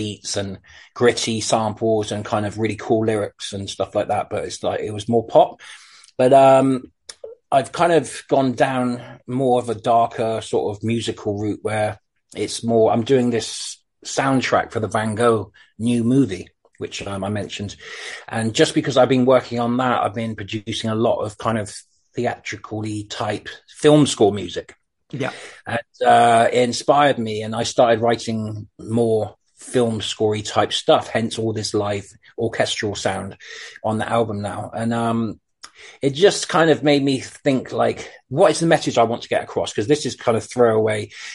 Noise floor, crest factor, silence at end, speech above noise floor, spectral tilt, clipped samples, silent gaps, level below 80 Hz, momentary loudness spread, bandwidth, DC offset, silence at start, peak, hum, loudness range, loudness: -39 dBFS; 18 dB; 0 s; 20 dB; -5 dB/octave; under 0.1%; none; -56 dBFS; 15 LU; 11.5 kHz; under 0.1%; 0 s; -2 dBFS; none; 5 LU; -20 LUFS